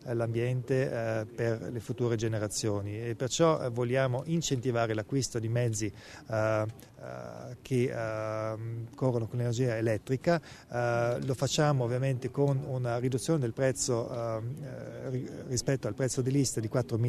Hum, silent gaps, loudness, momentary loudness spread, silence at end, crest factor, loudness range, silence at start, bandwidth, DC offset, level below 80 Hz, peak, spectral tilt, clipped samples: none; none; -31 LUFS; 9 LU; 0 s; 18 dB; 3 LU; 0 s; 13.5 kHz; under 0.1%; -60 dBFS; -12 dBFS; -5.5 dB/octave; under 0.1%